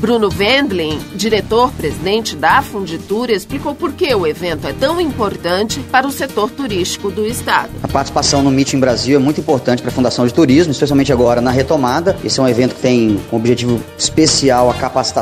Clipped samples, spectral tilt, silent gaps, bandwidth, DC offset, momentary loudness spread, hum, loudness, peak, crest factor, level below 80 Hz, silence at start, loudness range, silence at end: under 0.1%; -4.5 dB/octave; none; 15.5 kHz; under 0.1%; 7 LU; none; -14 LUFS; 0 dBFS; 14 dB; -36 dBFS; 0 s; 4 LU; 0 s